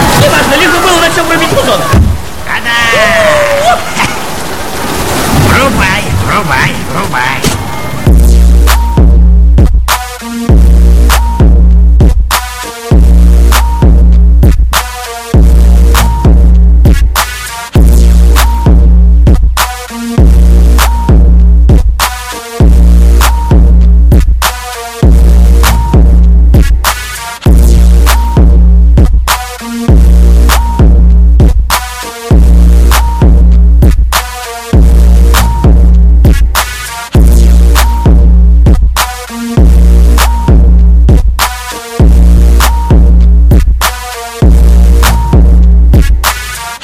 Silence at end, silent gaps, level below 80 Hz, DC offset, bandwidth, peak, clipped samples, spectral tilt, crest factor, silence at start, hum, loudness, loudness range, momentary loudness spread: 0.05 s; none; -6 dBFS; under 0.1%; 15.5 kHz; 0 dBFS; 2%; -5.5 dB/octave; 4 dB; 0 s; none; -7 LUFS; 1 LU; 7 LU